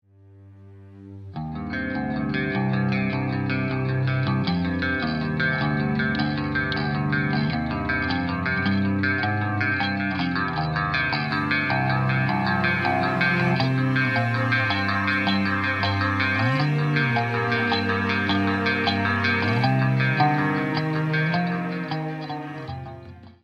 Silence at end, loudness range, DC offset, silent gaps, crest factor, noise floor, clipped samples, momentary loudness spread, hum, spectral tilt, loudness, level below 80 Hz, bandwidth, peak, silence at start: 0.15 s; 3 LU; under 0.1%; none; 16 dB; -49 dBFS; under 0.1%; 7 LU; none; -7.5 dB/octave; -23 LUFS; -48 dBFS; 7.2 kHz; -8 dBFS; 0.35 s